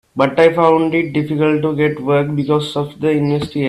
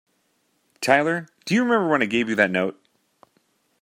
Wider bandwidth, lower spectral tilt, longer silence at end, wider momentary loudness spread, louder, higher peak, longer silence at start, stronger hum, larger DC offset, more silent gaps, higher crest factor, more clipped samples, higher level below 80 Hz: second, 12 kHz vs 16 kHz; first, -7.5 dB/octave vs -5 dB/octave; second, 0 s vs 1.1 s; second, 6 LU vs 9 LU; first, -15 LUFS vs -21 LUFS; about the same, 0 dBFS vs -2 dBFS; second, 0.15 s vs 0.8 s; neither; neither; neither; second, 16 dB vs 22 dB; neither; first, -50 dBFS vs -68 dBFS